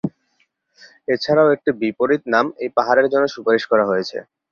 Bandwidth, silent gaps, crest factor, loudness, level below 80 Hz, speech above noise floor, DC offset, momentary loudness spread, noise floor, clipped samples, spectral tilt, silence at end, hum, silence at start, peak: 7 kHz; none; 16 dB; -18 LUFS; -62 dBFS; 48 dB; under 0.1%; 11 LU; -66 dBFS; under 0.1%; -6 dB/octave; 0.3 s; none; 0.05 s; -2 dBFS